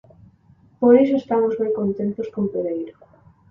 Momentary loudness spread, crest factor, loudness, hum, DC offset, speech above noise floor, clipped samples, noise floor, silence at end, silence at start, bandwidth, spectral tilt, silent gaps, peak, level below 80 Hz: 12 LU; 18 dB; -20 LUFS; none; under 0.1%; 35 dB; under 0.1%; -54 dBFS; 0.6 s; 0.8 s; 5.6 kHz; -9.5 dB/octave; none; -2 dBFS; -60 dBFS